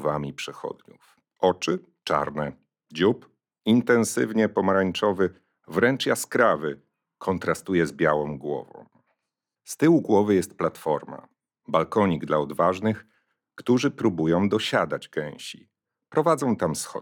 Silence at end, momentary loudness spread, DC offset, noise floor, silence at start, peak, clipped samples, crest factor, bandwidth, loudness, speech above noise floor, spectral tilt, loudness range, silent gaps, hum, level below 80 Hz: 0 s; 13 LU; under 0.1%; -85 dBFS; 0 s; -6 dBFS; under 0.1%; 20 dB; 20 kHz; -24 LUFS; 61 dB; -5.5 dB/octave; 3 LU; none; none; -64 dBFS